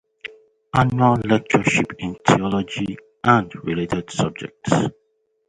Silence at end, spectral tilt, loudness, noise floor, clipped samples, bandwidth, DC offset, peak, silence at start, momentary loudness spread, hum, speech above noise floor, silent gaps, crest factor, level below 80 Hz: 0.6 s; -6 dB/octave; -20 LUFS; -40 dBFS; under 0.1%; 10.5 kHz; under 0.1%; 0 dBFS; 0.25 s; 11 LU; none; 21 dB; none; 20 dB; -48 dBFS